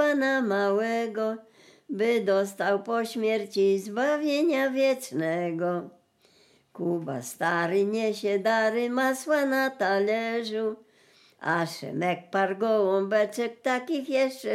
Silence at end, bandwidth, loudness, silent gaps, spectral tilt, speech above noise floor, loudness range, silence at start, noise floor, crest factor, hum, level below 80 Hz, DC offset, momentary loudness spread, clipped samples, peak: 0 s; 16 kHz; -27 LUFS; none; -5 dB/octave; 36 dB; 3 LU; 0 s; -62 dBFS; 16 dB; none; -86 dBFS; under 0.1%; 7 LU; under 0.1%; -12 dBFS